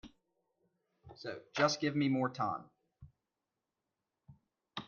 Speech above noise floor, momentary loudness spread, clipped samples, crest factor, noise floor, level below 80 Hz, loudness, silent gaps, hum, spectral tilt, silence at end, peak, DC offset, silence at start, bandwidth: 55 dB; 15 LU; under 0.1%; 24 dB; -89 dBFS; -74 dBFS; -35 LUFS; none; none; -5 dB/octave; 0 s; -16 dBFS; under 0.1%; 0.05 s; 7.2 kHz